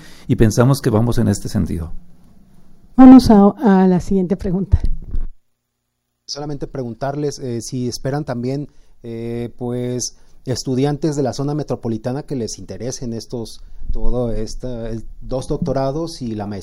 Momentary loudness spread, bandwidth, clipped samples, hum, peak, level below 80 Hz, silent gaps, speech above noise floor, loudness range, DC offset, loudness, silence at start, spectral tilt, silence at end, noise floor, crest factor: 17 LU; 13 kHz; 0.1%; none; 0 dBFS; -28 dBFS; none; 57 dB; 13 LU; under 0.1%; -17 LUFS; 0 s; -7 dB/octave; 0 s; -73 dBFS; 16 dB